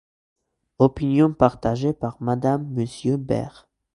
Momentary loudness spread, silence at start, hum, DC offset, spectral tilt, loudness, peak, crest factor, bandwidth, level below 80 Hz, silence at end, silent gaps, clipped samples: 8 LU; 0.8 s; none; under 0.1%; -8.5 dB/octave; -22 LUFS; 0 dBFS; 22 dB; 11 kHz; -48 dBFS; 0.45 s; none; under 0.1%